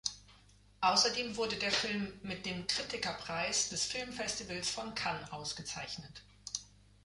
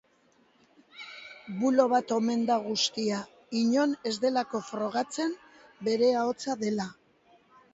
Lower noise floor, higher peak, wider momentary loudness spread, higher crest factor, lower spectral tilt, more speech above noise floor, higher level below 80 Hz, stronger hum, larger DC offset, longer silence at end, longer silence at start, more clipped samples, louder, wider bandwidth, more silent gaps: about the same, -63 dBFS vs -65 dBFS; second, -16 dBFS vs -10 dBFS; second, 12 LU vs 15 LU; about the same, 22 dB vs 20 dB; second, -1.5 dB/octave vs -4 dB/octave; second, 26 dB vs 38 dB; first, -64 dBFS vs -74 dBFS; first, 50 Hz at -60 dBFS vs none; neither; second, 0.4 s vs 0.8 s; second, 0.05 s vs 0.95 s; neither; second, -35 LUFS vs -28 LUFS; first, 11.5 kHz vs 8 kHz; neither